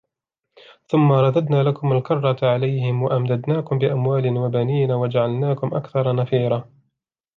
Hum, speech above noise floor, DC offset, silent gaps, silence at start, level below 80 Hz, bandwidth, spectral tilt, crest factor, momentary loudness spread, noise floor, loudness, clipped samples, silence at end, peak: none; 61 dB; under 0.1%; none; 0.9 s; -64 dBFS; 4.5 kHz; -10 dB/octave; 14 dB; 5 LU; -80 dBFS; -20 LUFS; under 0.1%; 0.75 s; -6 dBFS